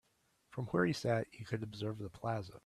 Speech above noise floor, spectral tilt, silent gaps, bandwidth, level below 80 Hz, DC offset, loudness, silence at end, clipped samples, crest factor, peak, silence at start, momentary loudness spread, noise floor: 38 dB; -6.5 dB/octave; none; 13 kHz; -68 dBFS; under 0.1%; -38 LUFS; 0.05 s; under 0.1%; 20 dB; -18 dBFS; 0.5 s; 9 LU; -76 dBFS